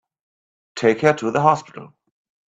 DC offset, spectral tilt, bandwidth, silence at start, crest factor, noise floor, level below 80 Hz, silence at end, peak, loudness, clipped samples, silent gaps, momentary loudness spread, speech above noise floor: under 0.1%; -6 dB/octave; 8 kHz; 0.75 s; 22 dB; under -90 dBFS; -62 dBFS; 0.6 s; 0 dBFS; -18 LUFS; under 0.1%; none; 17 LU; over 72 dB